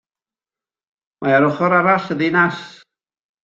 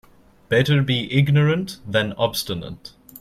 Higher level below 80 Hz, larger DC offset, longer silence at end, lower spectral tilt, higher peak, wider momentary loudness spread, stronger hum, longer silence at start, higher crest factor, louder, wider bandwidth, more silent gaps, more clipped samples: second, -62 dBFS vs -52 dBFS; neither; first, 0.75 s vs 0.35 s; first, -7.5 dB/octave vs -6 dB/octave; first, -2 dBFS vs -6 dBFS; second, 7 LU vs 15 LU; neither; first, 1.2 s vs 0.5 s; about the same, 16 dB vs 16 dB; first, -16 LUFS vs -20 LUFS; second, 7.6 kHz vs 15 kHz; neither; neither